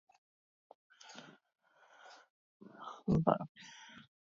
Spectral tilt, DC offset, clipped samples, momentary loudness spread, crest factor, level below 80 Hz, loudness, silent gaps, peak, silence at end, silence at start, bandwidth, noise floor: -7 dB/octave; under 0.1%; under 0.1%; 27 LU; 28 dB; -66 dBFS; -36 LUFS; 2.30-2.60 s, 3.49-3.55 s; -12 dBFS; 0.3 s; 1.1 s; 7.4 kHz; -63 dBFS